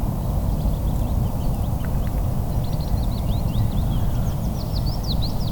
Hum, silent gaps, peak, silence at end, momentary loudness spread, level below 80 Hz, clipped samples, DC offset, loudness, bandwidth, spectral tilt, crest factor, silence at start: none; none; -8 dBFS; 0 s; 2 LU; -24 dBFS; under 0.1%; under 0.1%; -24 LUFS; 19.5 kHz; -7 dB/octave; 12 dB; 0 s